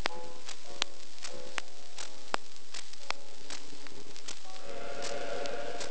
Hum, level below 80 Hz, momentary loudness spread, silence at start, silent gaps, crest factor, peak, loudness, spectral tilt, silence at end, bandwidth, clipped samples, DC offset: none; -68 dBFS; 9 LU; 0 s; none; 36 dB; -6 dBFS; -41 LUFS; -2 dB/octave; 0 s; 9.2 kHz; under 0.1%; 5%